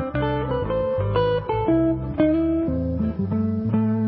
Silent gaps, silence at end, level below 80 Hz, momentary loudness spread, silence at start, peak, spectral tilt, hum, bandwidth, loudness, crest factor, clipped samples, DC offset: none; 0 s; -36 dBFS; 4 LU; 0 s; -8 dBFS; -12.5 dB/octave; none; 4.7 kHz; -23 LUFS; 14 dB; under 0.1%; under 0.1%